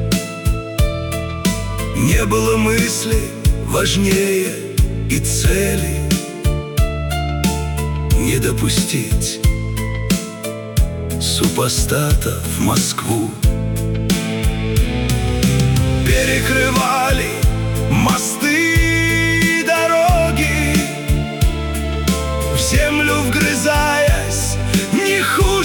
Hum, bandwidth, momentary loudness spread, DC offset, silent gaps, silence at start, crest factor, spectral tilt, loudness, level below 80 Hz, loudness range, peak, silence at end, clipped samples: none; 19 kHz; 6 LU; under 0.1%; none; 0 s; 14 dB; -4.5 dB/octave; -17 LUFS; -22 dBFS; 4 LU; -2 dBFS; 0 s; under 0.1%